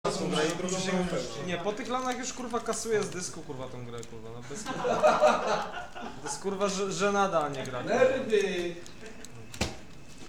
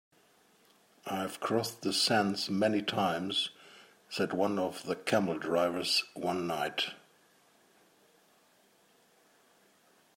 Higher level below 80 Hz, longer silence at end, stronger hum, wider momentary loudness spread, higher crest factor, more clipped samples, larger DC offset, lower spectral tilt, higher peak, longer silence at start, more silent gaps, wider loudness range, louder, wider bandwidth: first, -54 dBFS vs -80 dBFS; second, 0 s vs 3.2 s; neither; first, 18 LU vs 9 LU; about the same, 20 dB vs 22 dB; neither; first, 0.6% vs under 0.1%; about the same, -4 dB/octave vs -4 dB/octave; about the same, -10 dBFS vs -12 dBFS; second, 0.05 s vs 1.05 s; neither; second, 5 LU vs 8 LU; about the same, -30 LUFS vs -32 LUFS; about the same, 17.5 kHz vs 16 kHz